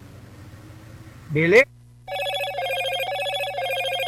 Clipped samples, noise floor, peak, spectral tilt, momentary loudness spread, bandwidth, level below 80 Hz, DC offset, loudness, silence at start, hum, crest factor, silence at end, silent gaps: under 0.1%; -43 dBFS; -4 dBFS; -4.5 dB/octave; 27 LU; 17 kHz; -56 dBFS; under 0.1%; -22 LUFS; 0 s; 60 Hz at -50 dBFS; 20 dB; 0 s; none